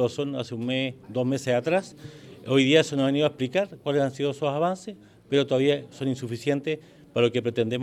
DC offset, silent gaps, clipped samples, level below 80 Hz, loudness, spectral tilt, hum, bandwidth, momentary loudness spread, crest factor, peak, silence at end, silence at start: under 0.1%; none; under 0.1%; -68 dBFS; -26 LUFS; -6 dB/octave; none; 13 kHz; 11 LU; 20 dB; -6 dBFS; 0 s; 0 s